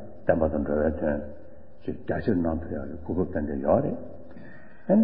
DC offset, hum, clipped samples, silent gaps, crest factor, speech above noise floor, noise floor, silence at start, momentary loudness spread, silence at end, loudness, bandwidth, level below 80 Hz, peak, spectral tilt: 1%; none; under 0.1%; none; 20 dB; 21 dB; -48 dBFS; 0 s; 20 LU; 0 s; -28 LUFS; 4.9 kHz; -42 dBFS; -8 dBFS; -13 dB/octave